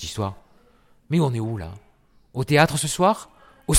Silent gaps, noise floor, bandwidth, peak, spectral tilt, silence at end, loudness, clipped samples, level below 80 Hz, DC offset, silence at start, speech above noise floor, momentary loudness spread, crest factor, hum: none; -56 dBFS; 16.5 kHz; -2 dBFS; -4.5 dB/octave; 0 s; -22 LUFS; under 0.1%; -50 dBFS; under 0.1%; 0 s; 34 dB; 16 LU; 20 dB; none